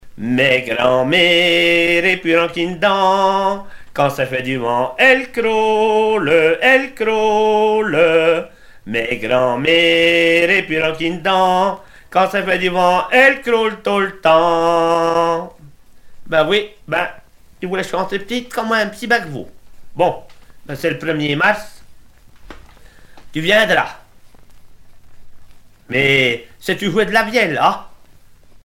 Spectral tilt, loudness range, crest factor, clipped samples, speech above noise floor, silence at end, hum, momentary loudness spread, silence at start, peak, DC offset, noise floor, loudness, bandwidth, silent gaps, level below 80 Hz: -4.5 dB/octave; 7 LU; 16 dB; under 0.1%; 28 dB; 0.1 s; none; 11 LU; 0.05 s; 0 dBFS; under 0.1%; -43 dBFS; -15 LUFS; 16.5 kHz; none; -48 dBFS